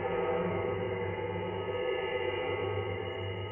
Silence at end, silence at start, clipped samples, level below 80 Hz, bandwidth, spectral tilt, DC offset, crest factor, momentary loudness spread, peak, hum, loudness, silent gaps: 0 s; 0 s; under 0.1%; -58 dBFS; 3.5 kHz; -4.5 dB/octave; under 0.1%; 14 dB; 4 LU; -20 dBFS; none; -34 LUFS; none